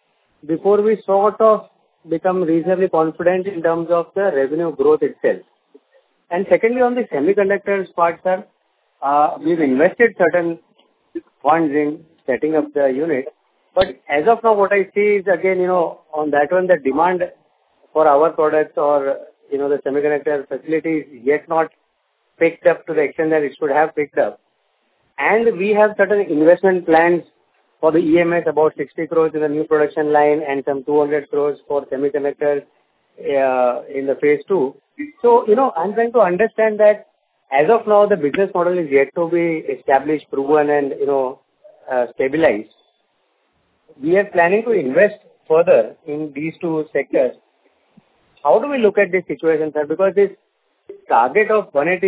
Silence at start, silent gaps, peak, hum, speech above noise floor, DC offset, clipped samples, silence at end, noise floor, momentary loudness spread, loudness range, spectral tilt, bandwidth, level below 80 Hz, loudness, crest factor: 0.45 s; none; 0 dBFS; none; 50 dB; under 0.1%; under 0.1%; 0 s; -66 dBFS; 9 LU; 4 LU; -10 dB/octave; 4 kHz; -60 dBFS; -17 LUFS; 16 dB